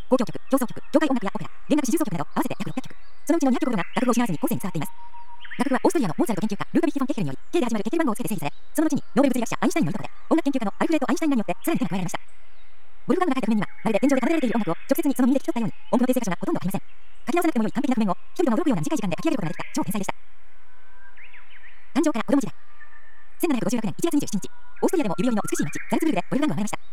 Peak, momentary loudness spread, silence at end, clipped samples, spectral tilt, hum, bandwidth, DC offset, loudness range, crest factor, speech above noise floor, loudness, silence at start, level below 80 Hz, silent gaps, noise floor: -6 dBFS; 9 LU; 0.15 s; under 0.1%; -5.5 dB/octave; none; 17.5 kHz; 5%; 4 LU; 18 dB; 33 dB; -25 LUFS; 0.1 s; -60 dBFS; none; -57 dBFS